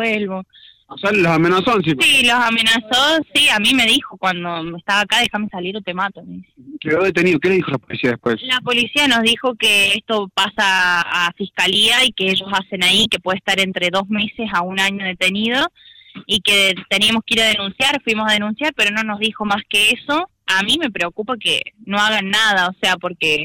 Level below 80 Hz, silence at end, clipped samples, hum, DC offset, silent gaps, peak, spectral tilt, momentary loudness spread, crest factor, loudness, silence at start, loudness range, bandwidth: -52 dBFS; 0 s; under 0.1%; none; under 0.1%; none; -6 dBFS; -3 dB/octave; 9 LU; 12 dB; -15 LUFS; 0 s; 5 LU; 16.5 kHz